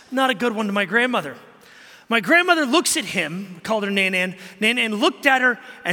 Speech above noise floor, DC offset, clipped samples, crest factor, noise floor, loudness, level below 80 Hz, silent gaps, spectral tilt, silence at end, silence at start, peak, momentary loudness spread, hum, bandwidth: 26 dB; under 0.1%; under 0.1%; 20 dB; -47 dBFS; -19 LUFS; -70 dBFS; none; -3 dB/octave; 0 s; 0.1 s; -2 dBFS; 10 LU; none; 17 kHz